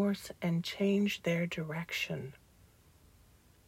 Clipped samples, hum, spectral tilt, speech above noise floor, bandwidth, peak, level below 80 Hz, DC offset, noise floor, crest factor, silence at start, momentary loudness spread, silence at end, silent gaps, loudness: under 0.1%; none; -6 dB/octave; 29 dB; 16 kHz; -20 dBFS; -66 dBFS; under 0.1%; -63 dBFS; 16 dB; 0 s; 8 LU; 1.35 s; none; -34 LUFS